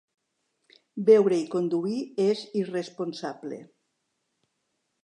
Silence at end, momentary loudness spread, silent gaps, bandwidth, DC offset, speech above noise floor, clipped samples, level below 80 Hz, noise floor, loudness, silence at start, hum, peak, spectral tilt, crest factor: 1.4 s; 19 LU; none; 10 kHz; under 0.1%; 53 dB; under 0.1%; -82 dBFS; -78 dBFS; -26 LUFS; 0.95 s; none; -8 dBFS; -6.5 dB/octave; 20 dB